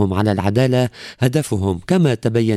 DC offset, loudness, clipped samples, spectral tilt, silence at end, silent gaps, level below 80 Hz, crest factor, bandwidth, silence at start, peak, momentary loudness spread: under 0.1%; -18 LUFS; under 0.1%; -7 dB/octave; 0 s; none; -48 dBFS; 14 dB; 14 kHz; 0 s; -2 dBFS; 5 LU